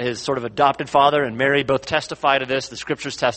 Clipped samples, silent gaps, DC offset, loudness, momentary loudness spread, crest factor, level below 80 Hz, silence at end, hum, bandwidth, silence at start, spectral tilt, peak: under 0.1%; none; under 0.1%; -20 LUFS; 8 LU; 18 dB; -54 dBFS; 0 s; none; 8.8 kHz; 0 s; -4 dB/octave; -2 dBFS